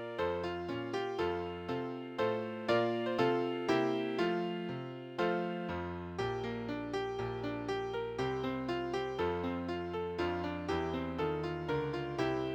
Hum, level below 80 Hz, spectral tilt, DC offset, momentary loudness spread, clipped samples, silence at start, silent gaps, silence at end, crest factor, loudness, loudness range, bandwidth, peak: none; -58 dBFS; -6.5 dB/octave; under 0.1%; 7 LU; under 0.1%; 0 s; none; 0 s; 18 dB; -36 LUFS; 4 LU; 9 kHz; -18 dBFS